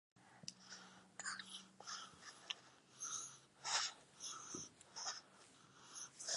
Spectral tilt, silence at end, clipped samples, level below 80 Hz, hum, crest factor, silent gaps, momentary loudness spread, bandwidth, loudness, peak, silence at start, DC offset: 0.5 dB/octave; 0 s; under 0.1%; under -90 dBFS; none; 28 dB; none; 17 LU; 11.5 kHz; -48 LUFS; -24 dBFS; 0.15 s; under 0.1%